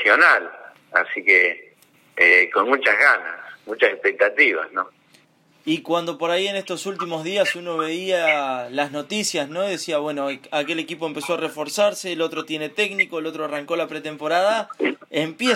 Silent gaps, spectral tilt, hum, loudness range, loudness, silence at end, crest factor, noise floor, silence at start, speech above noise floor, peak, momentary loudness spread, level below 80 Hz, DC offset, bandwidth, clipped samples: none; -3 dB/octave; none; 7 LU; -20 LUFS; 0 s; 18 dB; -57 dBFS; 0 s; 36 dB; -2 dBFS; 13 LU; -82 dBFS; under 0.1%; 16 kHz; under 0.1%